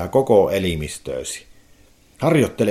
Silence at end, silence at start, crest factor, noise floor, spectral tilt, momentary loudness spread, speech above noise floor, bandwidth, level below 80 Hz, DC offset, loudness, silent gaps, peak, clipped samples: 0 s; 0 s; 18 dB; -51 dBFS; -5.5 dB/octave; 13 LU; 33 dB; 16 kHz; -44 dBFS; under 0.1%; -20 LUFS; none; -2 dBFS; under 0.1%